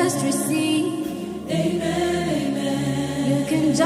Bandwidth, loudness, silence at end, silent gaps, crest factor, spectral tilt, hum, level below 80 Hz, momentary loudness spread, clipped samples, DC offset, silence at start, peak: 16 kHz; -23 LUFS; 0 s; none; 16 dB; -5 dB/octave; none; -50 dBFS; 5 LU; under 0.1%; under 0.1%; 0 s; -6 dBFS